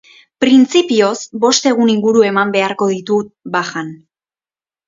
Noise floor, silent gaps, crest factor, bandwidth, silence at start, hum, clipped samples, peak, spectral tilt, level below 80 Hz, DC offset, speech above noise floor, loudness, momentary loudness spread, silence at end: under -90 dBFS; none; 14 dB; 7.8 kHz; 0.4 s; none; under 0.1%; 0 dBFS; -4 dB/octave; -60 dBFS; under 0.1%; over 77 dB; -14 LUFS; 9 LU; 0.9 s